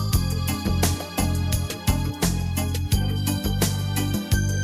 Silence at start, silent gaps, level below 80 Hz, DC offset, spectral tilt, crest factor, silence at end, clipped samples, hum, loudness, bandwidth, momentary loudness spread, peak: 0 s; none; -32 dBFS; under 0.1%; -5 dB/octave; 18 dB; 0 s; under 0.1%; none; -24 LUFS; 16 kHz; 2 LU; -6 dBFS